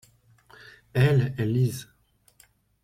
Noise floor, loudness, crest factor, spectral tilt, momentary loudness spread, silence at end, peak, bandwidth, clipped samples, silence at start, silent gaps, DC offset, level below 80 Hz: -61 dBFS; -25 LUFS; 18 dB; -7 dB/octave; 9 LU; 1 s; -10 dBFS; 15 kHz; under 0.1%; 0.95 s; none; under 0.1%; -56 dBFS